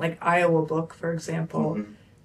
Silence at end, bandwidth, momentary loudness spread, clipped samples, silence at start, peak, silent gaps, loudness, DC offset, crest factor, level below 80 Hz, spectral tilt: 0.3 s; 12.5 kHz; 10 LU; under 0.1%; 0 s; -10 dBFS; none; -26 LUFS; under 0.1%; 16 dB; -64 dBFS; -6.5 dB/octave